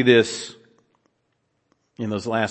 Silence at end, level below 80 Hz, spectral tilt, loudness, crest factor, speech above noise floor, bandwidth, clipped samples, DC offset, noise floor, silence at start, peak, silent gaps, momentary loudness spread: 0 s; -68 dBFS; -4.5 dB/octave; -23 LUFS; 22 dB; 51 dB; 8.8 kHz; under 0.1%; under 0.1%; -71 dBFS; 0 s; -2 dBFS; none; 16 LU